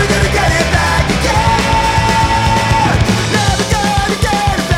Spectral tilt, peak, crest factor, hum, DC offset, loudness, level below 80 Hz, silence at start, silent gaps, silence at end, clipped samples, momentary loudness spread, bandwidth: -4.5 dB/octave; 0 dBFS; 12 dB; none; under 0.1%; -12 LUFS; -22 dBFS; 0 s; none; 0 s; under 0.1%; 2 LU; 16.5 kHz